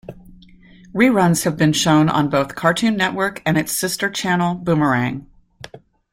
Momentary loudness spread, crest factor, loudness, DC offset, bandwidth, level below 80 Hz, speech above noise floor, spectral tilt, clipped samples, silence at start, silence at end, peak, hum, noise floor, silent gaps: 6 LU; 18 dB; -18 LUFS; under 0.1%; 16.5 kHz; -50 dBFS; 28 dB; -5 dB/octave; under 0.1%; 0.1 s; 0.35 s; -2 dBFS; none; -45 dBFS; none